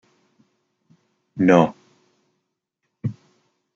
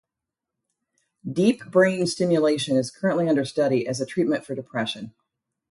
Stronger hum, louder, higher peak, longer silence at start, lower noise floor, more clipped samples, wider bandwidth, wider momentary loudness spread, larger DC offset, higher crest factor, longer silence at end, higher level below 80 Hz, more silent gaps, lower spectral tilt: neither; first, -20 LUFS vs -23 LUFS; first, 0 dBFS vs -6 dBFS; about the same, 1.35 s vs 1.25 s; second, -78 dBFS vs -86 dBFS; neither; second, 7.6 kHz vs 11.5 kHz; first, 16 LU vs 10 LU; neither; first, 24 dB vs 18 dB; about the same, 0.65 s vs 0.6 s; about the same, -64 dBFS vs -68 dBFS; neither; first, -7.5 dB/octave vs -5.5 dB/octave